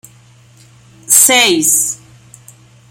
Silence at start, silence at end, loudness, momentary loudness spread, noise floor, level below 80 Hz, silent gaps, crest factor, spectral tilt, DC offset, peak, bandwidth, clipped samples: 1.1 s; 0.95 s; -8 LUFS; 12 LU; -44 dBFS; -58 dBFS; none; 16 dB; 0 dB/octave; under 0.1%; 0 dBFS; over 20 kHz; 0.2%